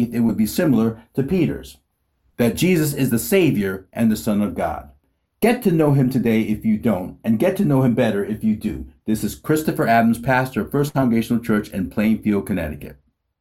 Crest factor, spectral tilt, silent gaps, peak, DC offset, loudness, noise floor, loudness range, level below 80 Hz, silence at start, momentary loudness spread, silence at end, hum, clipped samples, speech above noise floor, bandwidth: 16 dB; -6.5 dB/octave; none; -4 dBFS; under 0.1%; -20 LUFS; -66 dBFS; 2 LU; -46 dBFS; 0 s; 8 LU; 0.5 s; none; under 0.1%; 47 dB; 16.5 kHz